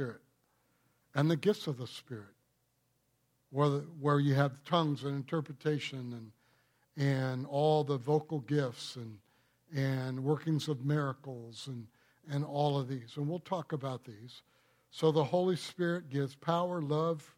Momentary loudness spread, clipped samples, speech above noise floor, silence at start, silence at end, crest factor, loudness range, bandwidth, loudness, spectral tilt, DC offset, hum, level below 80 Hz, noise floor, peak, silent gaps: 15 LU; under 0.1%; 43 dB; 0 s; 0.1 s; 20 dB; 4 LU; 14 kHz; -34 LUFS; -7 dB/octave; under 0.1%; none; -80 dBFS; -77 dBFS; -14 dBFS; none